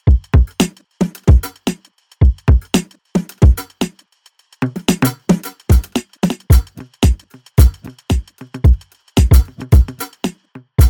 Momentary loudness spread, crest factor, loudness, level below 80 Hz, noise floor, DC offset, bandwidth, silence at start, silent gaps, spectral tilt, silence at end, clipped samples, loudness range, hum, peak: 11 LU; 14 dB; -16 LUFS; -16 dBFS; -54 dBFS; under 0.1%; 18.5 kHz; 0.05 s; none; -6.5 dB/octave; 0 s; under 0.1%; 2 LU; none; 0 dBFS